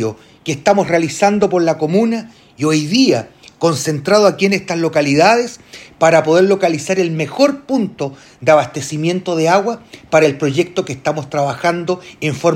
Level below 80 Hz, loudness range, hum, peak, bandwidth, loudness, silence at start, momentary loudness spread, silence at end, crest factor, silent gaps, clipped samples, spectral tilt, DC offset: -56 dBFS; 3 LU; none; 0 dBFS; 16 kHz; -15 LUFS; 0 s; 10 LU; 0 s; 14 dB; none; under 0.1%; -5 dB/octave; under 0.1%